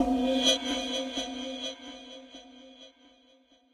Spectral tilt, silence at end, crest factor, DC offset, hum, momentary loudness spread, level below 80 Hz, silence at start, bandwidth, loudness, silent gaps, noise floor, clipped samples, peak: -1.5 dB/octave; 0.85 s; 22 dB; under 0.1%; none; 25 LU; -56 dBFS; 0 s; 13 kHz; -29 LUFS; none; -63 dBFS; under 0.1%; -10 dBFS